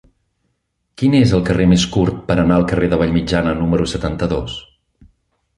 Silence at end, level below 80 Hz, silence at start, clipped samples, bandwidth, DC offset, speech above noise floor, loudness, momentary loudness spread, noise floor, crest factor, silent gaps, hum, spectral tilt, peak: 0.95 s; -34 dBFS; 1 s; under 0.1%; 11 kHz; under 0.1%; 55 dB; -16 LUFS; 7 LU; -70 dBFS; 16 dB; none; none; -6.5 dB/octave; -2 dBFS